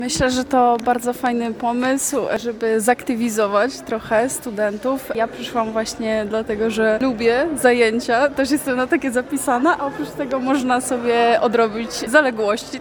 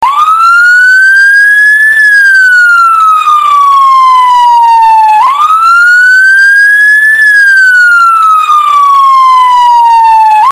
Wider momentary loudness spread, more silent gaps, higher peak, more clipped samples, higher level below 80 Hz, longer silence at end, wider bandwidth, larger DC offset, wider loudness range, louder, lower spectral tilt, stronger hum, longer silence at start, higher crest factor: first, 7 LU vs 3 LU; neither; about the same, -2 dBFS vs 0 dBFS; second, under 0.1% vs 9%; about the same, -48 dBFS vs -50 dBFS; about the same, 0 s vs 0 s; first, 18 kHz vs 16 kHz; second, under 0.1% vs 0.3%; about the same, 3 LU vs 1 LU; second, -19 LUFS vs -2 LUFS; first, -3.5 dB/octave vs 2 dB/octave; neither; about the same, 0 s vs 0 s; first, 18 dB vs 4 dB